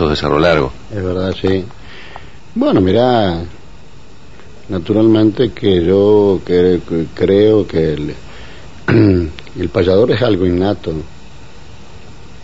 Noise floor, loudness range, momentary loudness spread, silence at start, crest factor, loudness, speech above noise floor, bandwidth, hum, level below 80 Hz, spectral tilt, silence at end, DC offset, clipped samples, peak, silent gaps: -40 dBFS; 5 LU; 16 LU; 0 s; 14 dB; -14 LUFS; 27 dB; 8 kHz; none; -36 dBFS; -8 dB/octave; 0.05 s; 3%; under 0.1%; 0 dBFS; none